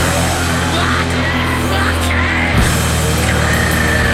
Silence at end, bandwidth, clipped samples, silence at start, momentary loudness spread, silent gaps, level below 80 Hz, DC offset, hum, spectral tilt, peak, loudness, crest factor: 0 s; 16 kHz; under 0.1%; 0 s; 2 LU; none; -22 dBFS; 0.3%; none; -4 dB/octave; -2 dBFS; -14 LUFS; 12 dB